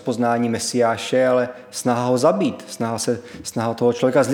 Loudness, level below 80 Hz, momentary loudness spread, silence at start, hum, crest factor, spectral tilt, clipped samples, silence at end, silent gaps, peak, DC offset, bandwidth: -20 LUFS; -62 dBFS; 8 LU; 0 s; none; 16 dB; -5 dB/octave; under 0.1%; 0 s; none; -4 dBFS; under 0.1%; 17.5 kHz